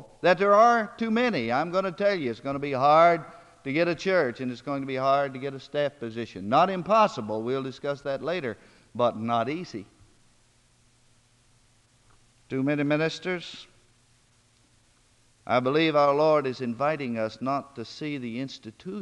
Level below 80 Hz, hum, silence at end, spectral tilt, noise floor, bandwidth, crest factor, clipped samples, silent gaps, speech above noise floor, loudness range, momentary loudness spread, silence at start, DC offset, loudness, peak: -66 dBFS; none; 0 s; -6 dB/octave; -63 dBFS; 10.5 kHz; 20 dB; under 0.1%; none; 37 dB; 8 LU; 15 LU; 0 s; under 0.1%; -26 LUFS; -8 dBFS